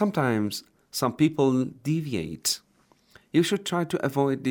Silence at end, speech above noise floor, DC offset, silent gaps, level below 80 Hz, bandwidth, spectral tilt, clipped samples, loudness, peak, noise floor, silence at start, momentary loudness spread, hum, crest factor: 0 s; 37 dB; under 0.1%; none; -64 dBFS; over 20 kHz; -5 dB/octave; under 0.1%; -26 LUFS; -8 dBFS; -63 dBFS; 0 s; 8 LU; none; 18 dB